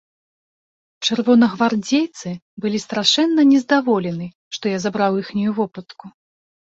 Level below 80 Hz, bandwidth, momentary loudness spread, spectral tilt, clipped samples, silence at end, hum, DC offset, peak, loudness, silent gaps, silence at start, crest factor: -62 dBFS; 8 kHz; 13 LU; -4.5 dB/octave; under 0.1%; 0.55 s; none; under 0.1%; 0 dBFS; -18 LUFS; 2.42-2.57 s, 4.35-4.51 s; 1 s; 18 dB